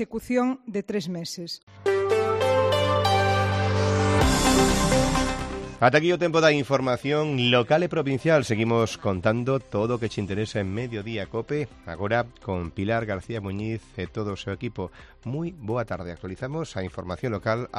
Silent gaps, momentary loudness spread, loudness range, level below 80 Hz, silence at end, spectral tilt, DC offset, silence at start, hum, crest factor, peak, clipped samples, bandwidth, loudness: 1.63-1.67 s; 13 LU; 10 LU; -40 dBFS; 0 s; -5 dB/octave; under 0.1%; 0 s; none; 20 dB; -4 dBFS; under 0.1%; 13.5 kHz; -25 LUFS